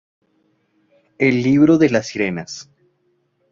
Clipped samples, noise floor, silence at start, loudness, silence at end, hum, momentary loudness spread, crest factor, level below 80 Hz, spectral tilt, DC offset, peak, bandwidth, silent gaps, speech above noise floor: under 0.1%; -65 dBFS; 1.2 s; -16 LUFS; 0.9 s; none; 17 LU; 18 dB; -56 dBFS; -6.5 dB/octave; under 0.1%; -2 dBFS; 7.6 kHz; none; 49 dB